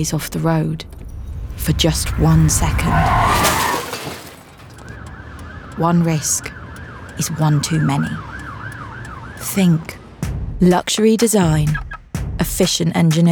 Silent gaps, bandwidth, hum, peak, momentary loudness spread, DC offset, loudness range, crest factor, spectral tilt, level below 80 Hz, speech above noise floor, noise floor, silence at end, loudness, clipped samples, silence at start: none; over 20 kHz; none; -2 dBFS; 19 LU; under 0.1%; 5 LU; 16 dB; -5 dB/octave; -30 dBFS; 23 dB; -39 dBFS; 0 s; -17 LUFS; under 0.1%; 0 s